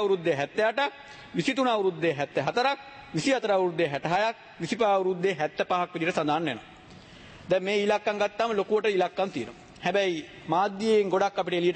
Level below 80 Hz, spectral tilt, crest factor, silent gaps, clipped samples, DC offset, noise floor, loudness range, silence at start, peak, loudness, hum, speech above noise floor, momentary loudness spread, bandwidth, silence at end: -66 dBFS; -5 dB/octave; 16 dB; none; under 0.1%; under 0.1%; -49 dBFS; 2 LU; 0 s; -12 dBFS; -27 LUFS; none; 22 dB; 9 LU; 8.8 kHz; 0 s